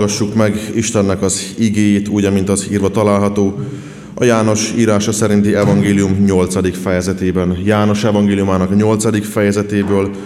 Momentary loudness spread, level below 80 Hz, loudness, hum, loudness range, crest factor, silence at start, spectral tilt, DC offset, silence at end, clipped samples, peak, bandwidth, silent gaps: 4 LU; -44 dBFS; -14 LUFS; none; 1 LU; 14 dB; 0 s; -5.5 dB/octave; 0.1%; 0 s; under 0.1%; 0 dBFS; 14 kHz; none